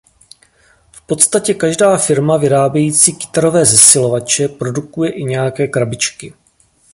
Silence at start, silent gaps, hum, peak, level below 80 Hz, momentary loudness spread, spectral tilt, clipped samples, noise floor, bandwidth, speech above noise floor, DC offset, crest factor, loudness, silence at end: 0.95 s; none; none; 0 dBFS; -52 dBFS; 13 LU; -3.5 dB/octave; 0.2%; -53 dBFS; 16 kHz; 41 dB; under 0.1%; 14 dB; -12 LUFS; 0.65 s